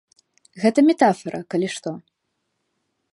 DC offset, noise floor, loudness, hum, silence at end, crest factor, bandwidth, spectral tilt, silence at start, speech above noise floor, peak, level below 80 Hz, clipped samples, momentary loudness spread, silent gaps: under 0.1%; -75 dBFS; -20 LUFS; none; 1.15 s; 20 dB; 11.5 kHz; -5.5 dB/octave; 0.55 s; 56 dB; -2 dBFS; -72 dBFS; under 0.1%; 15 LU; none